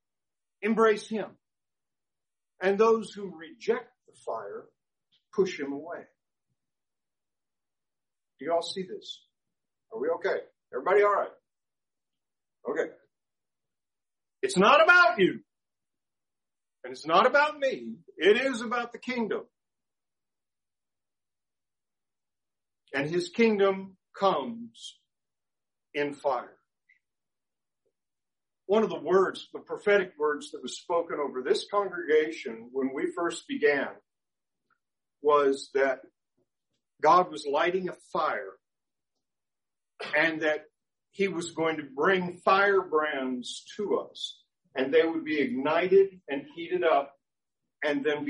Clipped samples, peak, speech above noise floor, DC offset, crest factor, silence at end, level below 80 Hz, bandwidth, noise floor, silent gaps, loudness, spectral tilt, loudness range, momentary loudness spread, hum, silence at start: under 0.1%; -8 dBFS; over 63 dB; under 0.1%; 22 dB; 0 s; -80 dBFS; 10.5 kHz; under -90 dBFS; none; -27 LUFS; -4.5 dB/octave; 13 LU; 16 LU; none; 0.6 s